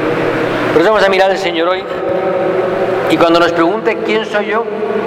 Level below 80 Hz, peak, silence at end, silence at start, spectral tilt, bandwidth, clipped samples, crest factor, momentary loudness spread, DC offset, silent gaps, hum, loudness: -46 dBFS; 0 dBFS; 0 s; 0 s; -5.5 dB/octave; 15 kHz; under 0.1%; 12 dB; 6 LU; under 0.1%; none; none; -13 LUFS